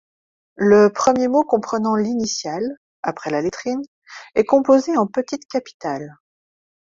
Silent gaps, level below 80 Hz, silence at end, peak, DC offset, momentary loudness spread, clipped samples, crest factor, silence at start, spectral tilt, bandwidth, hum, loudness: 2.77-3.03 s, 3.88-4.02 s, 5.45-5.49 s, 5.74-5.80 s; -60 dBFS; 0.7 s; -2 dBFS; under 0.1%; 14 LU; under 0.1%; 18 dB; 0.6 s; -5 dB/octave; 7.6 kHz; none; -19 LUFS